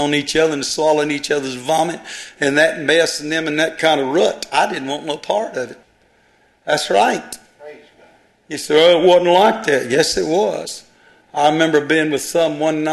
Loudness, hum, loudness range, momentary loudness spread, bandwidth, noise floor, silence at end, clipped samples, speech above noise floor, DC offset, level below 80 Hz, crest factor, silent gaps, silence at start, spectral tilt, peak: -16 LUFS; none; 6 LU; 15 LU; 13 kHz; -56 dBFS; 0 s; under 0.1%; 39 dB; under 0.1%; -56 dBFS; 16 dB; none; 0 s; -3.5 dB/octave; 0 dBFS